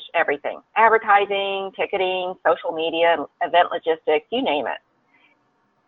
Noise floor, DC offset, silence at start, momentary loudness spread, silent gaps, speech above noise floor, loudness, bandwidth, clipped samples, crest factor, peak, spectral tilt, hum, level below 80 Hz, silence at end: -65 dBFS; under 0.1%; 0 s; 9 LU; none; 45 dB; -21 LUFS; 4.3 kHz; under 0.1%; 18 dB; -4 dBFS; -6.5 dB/octave; none; -68 dBFS; 1.1 s